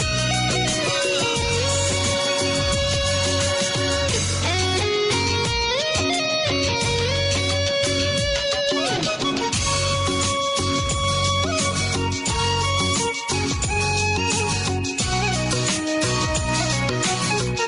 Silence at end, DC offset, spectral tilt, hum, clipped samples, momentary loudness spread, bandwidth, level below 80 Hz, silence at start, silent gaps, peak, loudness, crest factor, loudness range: 0 s; under 0.1%; -3 dB/octave; none; under 0.1%; 2 LU; 11 kHz; -38 dBFS; 0 s; none; -10 dBFS; -21 LUFS; 10 dB; 1 LU